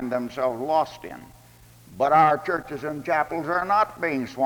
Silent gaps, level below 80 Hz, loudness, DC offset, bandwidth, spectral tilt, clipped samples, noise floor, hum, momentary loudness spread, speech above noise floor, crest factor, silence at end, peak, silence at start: none; -58 dBFS; -24 LUFS; under 0.1%; over 20 kHz; -6 dB/octave; under 0.1%; -51 dBFS; none; 13 LU; 27 dB; 18 dB; 0 s; -6 dBFS; 0 s